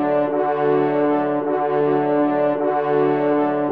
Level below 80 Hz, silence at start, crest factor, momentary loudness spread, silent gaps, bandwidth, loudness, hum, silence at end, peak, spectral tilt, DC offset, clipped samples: -72 dBFS; 0 s; 10 dB; 2 LU; none; 4.8 kHz; -19 LUFS; none; 0 s; -8 dBFS; -10 dB/octave; 0.2%; under 0.1%